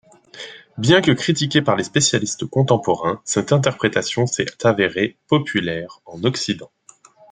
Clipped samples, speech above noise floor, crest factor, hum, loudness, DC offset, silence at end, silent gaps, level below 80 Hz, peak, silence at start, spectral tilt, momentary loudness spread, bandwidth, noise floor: under 0.1%; 31 dB; 18 dB; none; -19 LUFS; under 0.1%; 0.65 s; none; -56 dBFS; -2 dBFS; 0.35 s; -4.5 dB/octave; 11 LU; 9.6 kHz; -49 dBFS